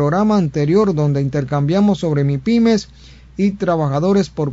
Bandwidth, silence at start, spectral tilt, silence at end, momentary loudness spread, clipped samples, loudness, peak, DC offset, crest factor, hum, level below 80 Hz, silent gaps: 7.8 kHz; 0 s; -8 dB/octave; 0 s; 5 LU; under 0.1%; -16 LUFS; -2 dBFS; under 0.1%; 14 dB; none; -44 dBFS; none